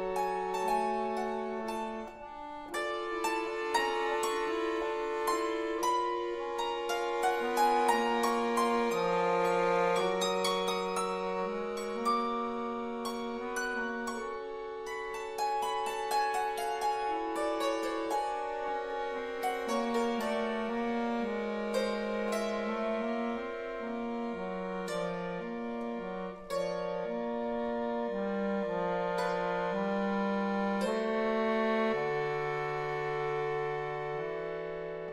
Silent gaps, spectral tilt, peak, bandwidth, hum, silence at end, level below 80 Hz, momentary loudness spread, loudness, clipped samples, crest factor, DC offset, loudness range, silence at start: none; -4.5 dB/octave; -14 dBFS; 15.5 kHz; none; 0 s; -62 dBFS; 8 LU; -33 LUFS; under 0.1%; 18 dB; under 0.1%; 6 LU; 0 s